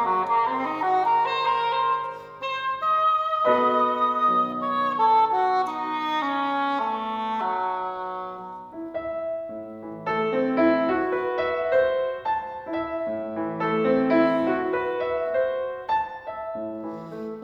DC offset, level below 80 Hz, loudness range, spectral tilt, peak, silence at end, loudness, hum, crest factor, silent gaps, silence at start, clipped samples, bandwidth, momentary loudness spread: under 0.1%; -60 dBFS; 6 LU; -6.5 dB/octave; -8 dBFS; 0 s; -24 LUFS; none; 16 dB; none; 0 s; under 0.1%; 7.4 kHz; 12 LU